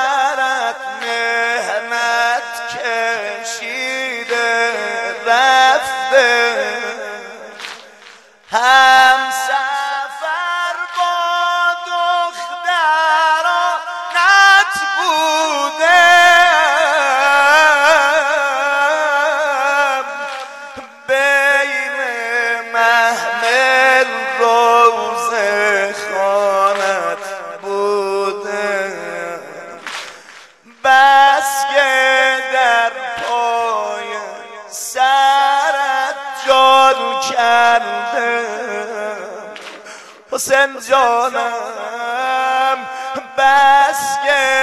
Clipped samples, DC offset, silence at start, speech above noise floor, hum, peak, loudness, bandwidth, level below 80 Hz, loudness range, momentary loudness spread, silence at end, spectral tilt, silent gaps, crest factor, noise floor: under 0.1%; under 0.1%; 0 s; 28 dB; none; 0 dBFS; -14 LUFS; 15 kHz; -62 dBFS; 7 LU; 15 LU; 0 s; 0 dB/octave; none; 14 dB; -42 dBFS